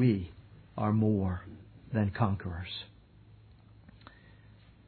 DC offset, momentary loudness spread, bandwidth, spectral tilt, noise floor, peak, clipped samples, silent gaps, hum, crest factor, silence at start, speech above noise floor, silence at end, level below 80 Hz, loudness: under 0.1%; 24 LU; 4.5 kHz; -11 dB/octave; -57 dBFS; -12 dBFS; under 0.1%; none; none; 20 dB; 0 s; 27 dB; 2 s; -56 dBFS; -32 LUFS